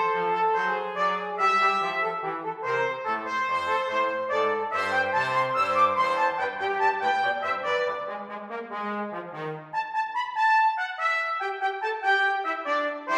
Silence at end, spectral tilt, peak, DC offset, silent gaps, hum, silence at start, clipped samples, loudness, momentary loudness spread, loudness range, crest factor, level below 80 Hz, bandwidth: 0 s; -3.5 dB/octave; -10 dBFS; under 0.1%; none; none; 0 s; under 0.1%; -26 LUFS; 10 LU; 4 LU; 16 dB; -76 dBFS; 14 kHz